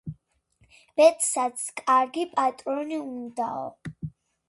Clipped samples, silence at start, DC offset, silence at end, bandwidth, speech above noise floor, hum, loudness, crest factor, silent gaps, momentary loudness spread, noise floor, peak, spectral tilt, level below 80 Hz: under 0.1%; 0.05 s; under 0.1%; 0.4 s; 12 kHz; 41 dB; none; -25 LUFS; 20 dB; none; 19 LU; -65 dBFS; -6 dBFS; -3.5 dB/octave; -62 dBFS